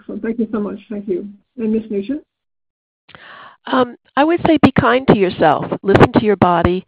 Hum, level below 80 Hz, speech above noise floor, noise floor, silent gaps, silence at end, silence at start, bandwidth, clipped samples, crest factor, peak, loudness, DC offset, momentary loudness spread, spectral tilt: none; -42 dBFS; 25 dB; -40 dBFS; 2.70-3.08 s; 0.05 s; 0.1 s; 9.2 kHz; under 0.1%; 16 dB; 0 dBFS; -15 LUFS; under 0.1%; 13 LU; -8.5 dB/octave